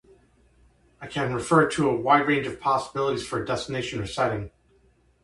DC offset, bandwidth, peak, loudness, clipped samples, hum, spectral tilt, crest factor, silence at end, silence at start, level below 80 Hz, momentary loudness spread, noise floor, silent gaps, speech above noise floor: under 0.1%; 11.5 kHz; -6 dBFS; -25 LUFS; under 0.1%; none; -5.5 dB/octave; 20 dB; 0.75 s; 1 s; -54 dBFS; 11 LU; -62 dBFS; none; 37 dB